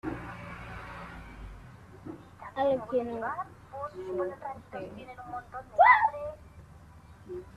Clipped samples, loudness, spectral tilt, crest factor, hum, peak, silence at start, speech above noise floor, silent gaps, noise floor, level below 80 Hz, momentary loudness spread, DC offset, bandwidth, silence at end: under 0.1%; -28 LUFS; -6.5 dB/octave; 24 dB; none; -8 dBFS; 0.05 s; 23 dB; none; -52 dBFS; -54 dBFS; 24 LU; under 0.1%; 13 kHz; 0 s